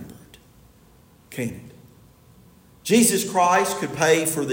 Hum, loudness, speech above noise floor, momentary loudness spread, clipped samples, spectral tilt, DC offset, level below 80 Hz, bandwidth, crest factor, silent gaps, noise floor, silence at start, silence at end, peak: none; -20 LUFS; 33 dB; 20 LU; under 0.1%; -3.5 dB/octave; under 0.1%; -60 dBFS; 16.5 kHz; 20 dB; none; -53 dBFS; 0 s; 0 s; -4 dBFS